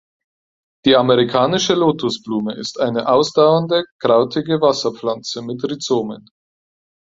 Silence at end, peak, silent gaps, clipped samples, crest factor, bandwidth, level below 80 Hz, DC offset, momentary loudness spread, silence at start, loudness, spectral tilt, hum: 0.9 s; 0 dBFS; 3.92-3.99 s; under 0.1%; 16 dB; 7.8 kHz; -58 dBFS; under 0.1%; 11 LU; 0.85 s; -17 LUFS; -5 dB/octave; none